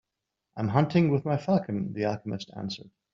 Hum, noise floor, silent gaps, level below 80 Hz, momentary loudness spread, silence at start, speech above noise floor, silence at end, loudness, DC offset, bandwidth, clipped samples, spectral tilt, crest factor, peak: none; -85 dBFS; none; -64 dBFS; 13 LU; 0.55 s; 58 dB; 0.25 s; -28 LUFS; under 0.1%; 7.4 kHz; under 0.1%; -7 dB/octave; 20 dB; -8 dBFS